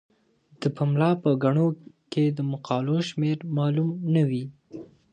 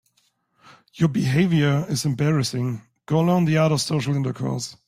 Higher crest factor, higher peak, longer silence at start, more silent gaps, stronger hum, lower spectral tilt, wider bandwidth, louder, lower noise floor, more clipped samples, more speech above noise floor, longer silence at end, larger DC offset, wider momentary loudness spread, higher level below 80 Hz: about the same, 18 dB vs 16 dB; about the same, -8 dBFS vs -6 dBFS; second, 0.6 s vs 0.95 s; neither; neither; first, -8 dB/octave vs -6 dB/octave; second, 9 kHz vs 15.5 kHz; second, -25 LUFS vs -22 LUFS; second, -60 dBFS vs -67 dBFS; neither; second, 37 dB vs 46 dB; first, 0.3 s vs 0.15 s; neither; first, 14 LU vs 8 LU; second, -70 dBFS vs -56 dBFS